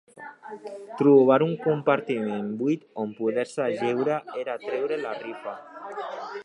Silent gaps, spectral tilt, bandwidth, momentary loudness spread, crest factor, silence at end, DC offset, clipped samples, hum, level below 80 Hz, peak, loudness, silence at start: none; -7.5 dB/octave; 10.5 kHz; 20 LU; 18 dB; 0 s; under 0.1%; under 0.1%; none; -80 dBFS; -6 dBFS; -25 LUFS; 0.15 s